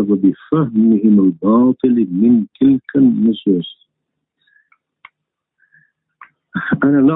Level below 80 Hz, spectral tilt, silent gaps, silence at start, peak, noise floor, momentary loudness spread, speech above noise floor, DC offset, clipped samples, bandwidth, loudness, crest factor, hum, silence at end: -54 dBFS; -13 dB/octave; none; 0 s; -2 dBFS; -77 dBFS; 7 LU; 64 dB; under 0.1%; under 0.1%; 3.9 kHz; -14 LUFS; 14 dB; none; 0 s